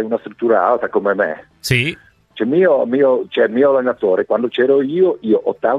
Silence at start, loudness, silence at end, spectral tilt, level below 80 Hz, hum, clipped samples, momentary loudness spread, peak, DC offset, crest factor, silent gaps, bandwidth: 0 s; -16 LUFS; 0 s; -6 dB/octave; -52 dBFS; none; under 0.1%; 6 LU; 0 dBFS; under 0.1%; 14 dB; none; 14.5 kHz